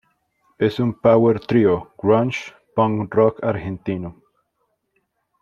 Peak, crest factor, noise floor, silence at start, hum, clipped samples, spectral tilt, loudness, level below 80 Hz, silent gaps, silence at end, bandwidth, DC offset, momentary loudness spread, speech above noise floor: -2 dBFS; 18 dB; -71 dBFS; 0.6 s; none; under 0.1%; -8 dB/octave; -19 LUFS; -54 dBFS; none; 1.3 s; 7.2 kHz; under 0.1%; 11 LU; 53 dB